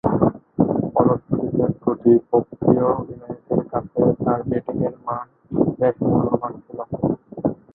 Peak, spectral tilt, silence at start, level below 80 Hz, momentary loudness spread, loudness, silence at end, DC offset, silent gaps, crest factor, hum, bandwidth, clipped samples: -2 dBFS; -14 dB/octave; 0.05 s; -48 dBFS; 11 LU; -21 LUFS; 0.2 s; under 0.1%; none; 18 dB; none; 3 kHz; under 0.1%